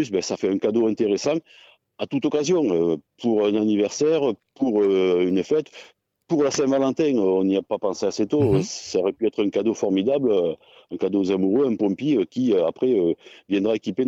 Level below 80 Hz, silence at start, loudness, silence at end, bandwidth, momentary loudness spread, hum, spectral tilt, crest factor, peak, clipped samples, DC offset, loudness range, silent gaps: -58 dBFS; 0 s; -22 LUFS; 0 s; 8 kHz; 6 LU; none; -6 dB/octave; 12 dB; -10 dBFS; under 0.1%; under 0.1%; 1 LU; none